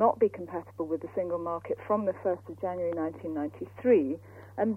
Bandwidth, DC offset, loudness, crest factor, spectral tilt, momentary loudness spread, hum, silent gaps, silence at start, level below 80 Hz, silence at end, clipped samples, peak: 3.5 kHz; under 0.1%; -31 LUFS; 20 dB; -9.5 dB/octave; 12 LU; none; none; 0 s; -68 dBFS; 0 s; under 0.1%; -10 dBFS